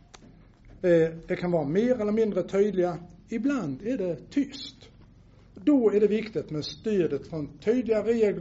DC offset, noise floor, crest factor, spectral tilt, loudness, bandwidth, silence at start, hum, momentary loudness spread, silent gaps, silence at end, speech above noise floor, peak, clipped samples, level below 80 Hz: under 0.1%; -54 dBFS; 16 dB; -6.5 dB/octave; -27 LUFS; 8 kHz; 0.65 s; none; 10 LU; none; 0 s; 28 dB; -12 dBFS; under 0.1%; -56 dBFS